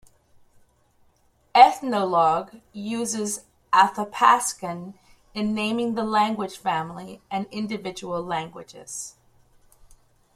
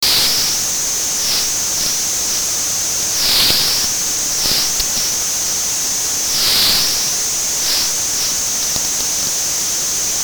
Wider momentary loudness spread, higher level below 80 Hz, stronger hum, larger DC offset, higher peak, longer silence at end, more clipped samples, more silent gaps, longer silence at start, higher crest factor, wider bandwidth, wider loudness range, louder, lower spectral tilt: first, 18 LU vs 4 LU; second, -62 dBFS vs -42 dBFS; neither; neither; about the same, -2 dBFS vs 0 dBFS; first, 1.25 s vs 0 s; neither; neither; first, 1.55 s vs 0 s; first, 24 dB vs 16 dB; second, 15 kHz vs over 20 kHz; first, 10 LU vs 1 LU; second, -23 LUFS vs -14 LUFS; first, -3.5 dB/octave vs 1 dB/octave